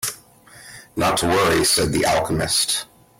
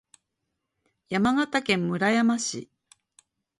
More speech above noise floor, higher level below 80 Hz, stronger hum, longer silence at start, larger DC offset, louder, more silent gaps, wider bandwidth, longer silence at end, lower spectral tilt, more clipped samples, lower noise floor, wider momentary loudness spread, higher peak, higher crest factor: second, 27 dB vs 57 dB; first, -44 dBFS vs -62 dBFS; neither; second, 0 s vs 1.1 s; neither; first, -19 LUFS vs -25 LUFS; neither; first, 16.5 kHz vs 11.5 kHz; second, 0.35 s vs 0.95 s; second, -3 dB/octave vs -4.5 dB/octave; neither; second, -47 dBFS vs -81 dBFS; about the same, 10 LU vs 9 LU; about the same, -8 dBFS vs -8 dBFS; second, 14 dB vs 20 dB